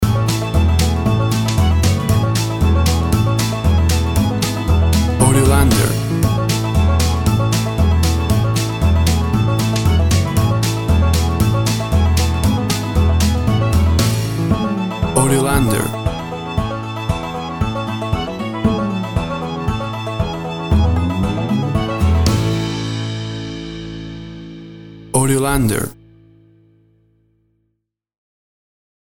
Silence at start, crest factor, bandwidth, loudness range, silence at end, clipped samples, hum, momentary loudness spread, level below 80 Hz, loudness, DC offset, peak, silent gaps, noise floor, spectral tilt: 0 s; 16 dB; 17.5 kHz; 6 LU; 3.1 s; under 0.1%; none; 9 LU; -24 dBFS; -17 LUFS; under 0.1%; 0 dBFS; none; -73 dBFS; -5.5 dB/octave